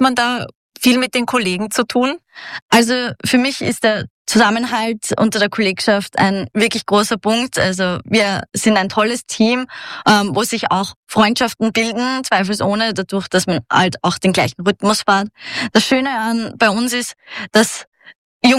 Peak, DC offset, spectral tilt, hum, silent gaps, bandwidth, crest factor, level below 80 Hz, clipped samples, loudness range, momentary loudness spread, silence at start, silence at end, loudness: -2 dBFS; under 0.1%; -4 dB/octave; none; 0.55-0.70 s, 2.62-2.69 s, 4.10-4.25 s, 10.96-11.03 s, 17.87-17.92 s, 18.15-18.40 s; 16 kHz; 14 dB; -54 dBFS; under 0.1%; 1 LU; 6 LU; 0 s; 0 s; -16 LUFS